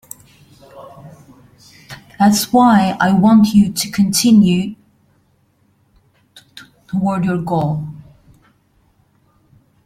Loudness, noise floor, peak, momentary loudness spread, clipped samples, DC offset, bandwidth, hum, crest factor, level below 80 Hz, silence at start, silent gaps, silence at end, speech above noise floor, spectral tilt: -14 LUFS; -58 dBFS; -2 dBFS; 26 LU; under 0.1%; under 0.1%; 16 kHz; none; 16 dB; -50 dBFS; 0.75 s; none; 1.85 s; 45 dB; -5.5 dB/octave